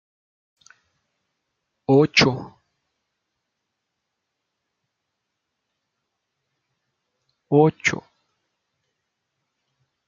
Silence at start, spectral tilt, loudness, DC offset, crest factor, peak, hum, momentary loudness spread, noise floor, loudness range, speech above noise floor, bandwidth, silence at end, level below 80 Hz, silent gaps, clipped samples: 1.9 s; -4 dB/octave; -19 LUFS; under 0.1%; 24 dB; -2 dBFS; none; 18 LU; -80 dBFS; 3 LU; 62 dB; 7.4 kHz; 2.1 s; -62 dBFS; none; under 0.1%